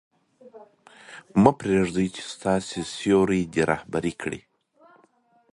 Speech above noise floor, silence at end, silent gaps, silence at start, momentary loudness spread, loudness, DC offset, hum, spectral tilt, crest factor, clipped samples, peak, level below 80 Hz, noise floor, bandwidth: 39 dB; 1.15 s; none; 0.45 s; 14 LU; -24 LUFS; under 0.1%; none; -6 dB/octave; 24 dB; under 0.1%; -2 dBFS; -52 dBFS; -62 dBFS; 11.5 kHz